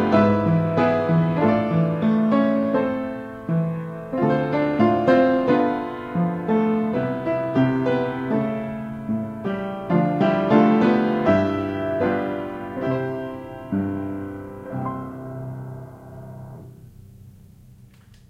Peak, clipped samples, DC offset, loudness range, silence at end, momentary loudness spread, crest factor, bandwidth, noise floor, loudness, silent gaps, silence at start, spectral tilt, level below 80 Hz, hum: -2 dBFS; under 0.1%; under 0.1%; 11 LU; 1 s; 16 LU; 20 dB; 6.6 kHz; -49 dBFS; -22 LUFS; none; 0 s; -9 dB/octave; -54 dBFS; none